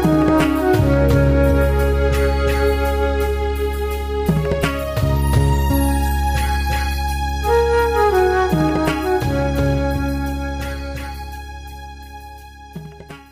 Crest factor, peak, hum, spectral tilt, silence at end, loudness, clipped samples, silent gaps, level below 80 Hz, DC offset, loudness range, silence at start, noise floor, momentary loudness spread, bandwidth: 12 dB; -6 dBFS; none; -6.5 dB/octave; 0.1 s; -18 LUFS; under 0.1%; none; -22 dBFS; 0.2%; 7 LU; 0 s; -37 dBFS; 20 LU; 16 kHz